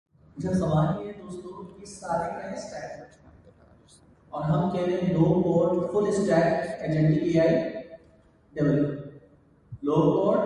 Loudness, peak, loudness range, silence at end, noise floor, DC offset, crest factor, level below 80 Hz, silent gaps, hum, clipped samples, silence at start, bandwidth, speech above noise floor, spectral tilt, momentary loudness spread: -25 LUFS; -10 dBFS; 10 LU; 0 s; -58 dBFS; under 0.1%; 16 dB; -54 dBFS; none; none; under 0.1%; 0.35 s; 10.5 kHz; 33 dB; -8 dB/octave; 18 LU